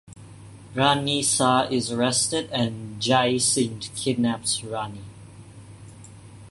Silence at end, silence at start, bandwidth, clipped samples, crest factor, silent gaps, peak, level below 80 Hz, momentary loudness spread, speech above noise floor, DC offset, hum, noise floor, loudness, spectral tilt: 0 s; 0.1 s; 12 kHz; under 0.1%; 20 dB; none; -6 dBFS; -56 dBFS; 12 LU; 21 dB; under 0.1%; none; -44 dBFS; -23 LUFS; -3.5 dB/octave